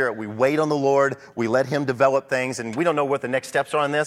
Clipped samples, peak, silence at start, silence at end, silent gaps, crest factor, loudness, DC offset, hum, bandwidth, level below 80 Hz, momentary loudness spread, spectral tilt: under 0.1%; -4 dBFS; 0 s; 0 s; none; 16 dB; -22 LUFS; under 0.1%; none; 14 kHz; -66 dBFS; 5 LU; -5.5 dB/octave